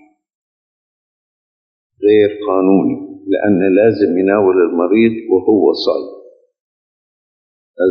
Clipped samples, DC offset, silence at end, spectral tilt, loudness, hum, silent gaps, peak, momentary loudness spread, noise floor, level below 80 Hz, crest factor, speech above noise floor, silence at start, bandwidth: under 0.1%; under 0.1%; 0 s; -8.5 dB/octave; -13 LUFS; none; 6.60-7.74 s; 0 dBFS; 8 LU; under -90 dBFS; -60 dBFS; 14 dB; over 78 dB; 2 s; 6.2 kHz